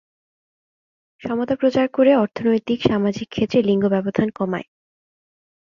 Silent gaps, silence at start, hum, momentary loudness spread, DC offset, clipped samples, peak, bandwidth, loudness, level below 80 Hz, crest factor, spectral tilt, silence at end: none; 1.2 s; none; 9 LU; under 0.1%; under 0.1%; -2 dBFS; 7.2 kHz; -20 LUFS; -54 dBFS; 20 dB; -7.5 dB/octave; 1.15 s